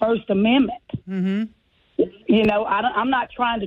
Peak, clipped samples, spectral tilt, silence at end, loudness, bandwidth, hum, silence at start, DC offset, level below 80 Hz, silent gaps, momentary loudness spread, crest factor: -8 dBFS; under 0.1%; -8 dB/octave; 0 s; -21 LUFS; 5.2 kHz; none; 0 s; under 0.1%; -52 dBFS; none; 12 LU; 14 dB